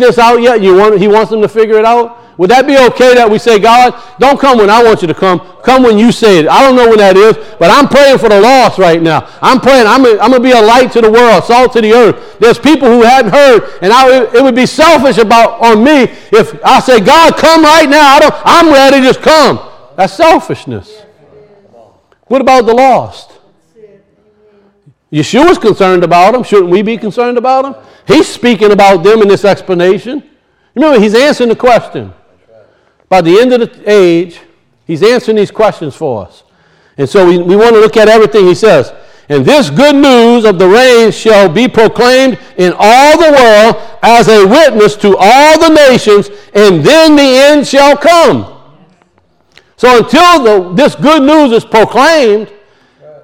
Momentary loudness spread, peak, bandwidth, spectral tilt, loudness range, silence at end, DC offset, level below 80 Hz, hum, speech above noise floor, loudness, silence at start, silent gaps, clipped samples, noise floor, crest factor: 8 LU; 0 dBFS; 18.5 kHz; -4.5 dB/octave; 6 LU; 0.8 s; under 0.1%; -38 dBFS; none; 46 dB; -5 LUFS; 0 s; none; 10%; -51 dBFS; 6 dB